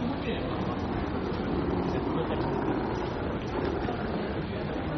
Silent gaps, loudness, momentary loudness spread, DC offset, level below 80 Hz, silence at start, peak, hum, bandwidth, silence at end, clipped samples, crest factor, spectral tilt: none; -31 LUFS; 3 LU; under 0.1%; -42 dBFS; 0 s; -16 dBFS; none; 6.4 kHz; 0 s; under 0.1%; 14 dB; -6 dB/octave